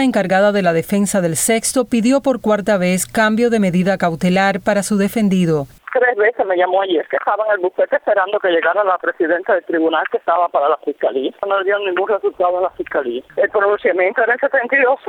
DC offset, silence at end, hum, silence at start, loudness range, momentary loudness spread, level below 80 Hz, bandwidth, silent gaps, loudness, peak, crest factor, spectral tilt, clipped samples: under 0.1%; 0 s; none; 0 s; 2 LU; 5 LU; -54 dBFS; 19.5 kHz; none; -16 LUFS; -2 dBFS; 14 dB; -5 dB/octave; under 0.1%